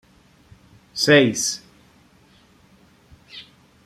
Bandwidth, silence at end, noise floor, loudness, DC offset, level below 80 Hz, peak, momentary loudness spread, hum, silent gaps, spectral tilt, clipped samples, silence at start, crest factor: 15.5 kHz; 0.45 s; -54 dBFS; -18 LUFS; under 0.1%; -62 dBFS; -2 dBFS; 26 LU; none; none; -3.5 dB/octave; under 0.1%; 0.95 s; 22 dB